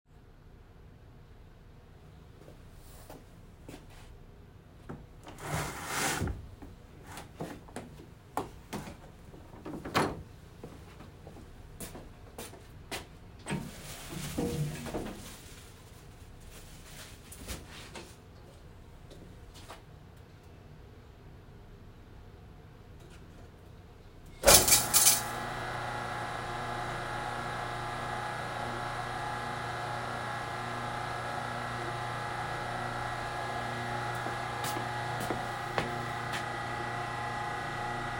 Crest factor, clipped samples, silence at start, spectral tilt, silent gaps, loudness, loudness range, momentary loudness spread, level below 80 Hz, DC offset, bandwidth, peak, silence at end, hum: 34 dB; under 0.1%; 0.1 s; -2.5 dB/octave; none; -32 LUFS; 27 LU; 20 LU; -52 dBFS; under 0.1%; 16 kHz; -2 dBFS; 0 s; none